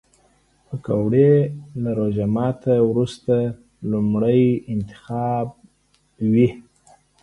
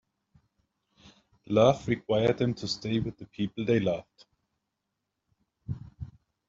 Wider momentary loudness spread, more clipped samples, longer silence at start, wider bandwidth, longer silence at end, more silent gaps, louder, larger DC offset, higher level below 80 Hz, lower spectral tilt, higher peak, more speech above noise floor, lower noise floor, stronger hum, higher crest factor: second, 12 LU vs 20 LU; neither; second, 0.7 s vs 1.5 s; first, 11 kHz vs 7.8 kHz; first, 0.6 s vs 0.4 s; neither; first, -20 LUFS vs -28 LUFS; neither; first, -52 dBFS vs -58 dBFS; first, -9.5 dB/octave vs -6.5 dB/octave; first, -4 dBFS vs -8 dBFS; second, 43 dB vs 56 dB; second, -62 dBFS vs -84 dBFS; neither; second, 16 dB vs 22 dB